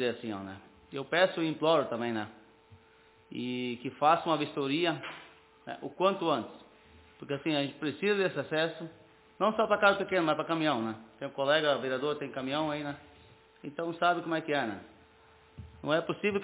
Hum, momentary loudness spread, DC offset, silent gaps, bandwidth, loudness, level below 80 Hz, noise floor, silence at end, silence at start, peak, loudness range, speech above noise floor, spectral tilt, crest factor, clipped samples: none; 18 LU; under 0.1%; none; 4 kHz; -31 LUFS; -68 dBFS; -61 dBFS; 0 s; 0 s; -10 dBFS; 5 LU; 31 dB; -3 dB/octave; 22 dB; under 0.1%